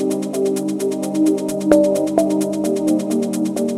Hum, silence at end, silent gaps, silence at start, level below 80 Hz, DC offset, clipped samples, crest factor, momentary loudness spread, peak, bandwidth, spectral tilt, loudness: none; 0 s; none; 0 s; -58 dBFS; under 0.1%; under 0.1%; 18 dB; 6 LU; 0 dBFS; 15 kHz; -6 dB/octave; -18 LUFS